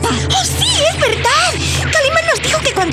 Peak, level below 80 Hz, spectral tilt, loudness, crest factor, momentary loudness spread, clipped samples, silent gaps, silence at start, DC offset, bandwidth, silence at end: -2 dBFS; -34 dBFS; -2.5 dB/octave; -13 LUFS; 10 dB; 2 LU; under 0.1%; none; 0 s; under 0.1%; 16 kHz; 0 s